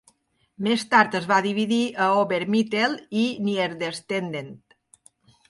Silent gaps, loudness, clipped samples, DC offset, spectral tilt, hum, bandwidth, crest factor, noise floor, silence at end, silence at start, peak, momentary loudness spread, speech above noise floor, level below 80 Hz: none; -23 LUFS; under 0.1%; under 0.1%; -5 dB/octave; none; 11.5 kHz; 20 dB; -65 dBFS; 0.9 s; 0.6 s; -4 dBFS; 10 LU; 42 dB; -70 dBFS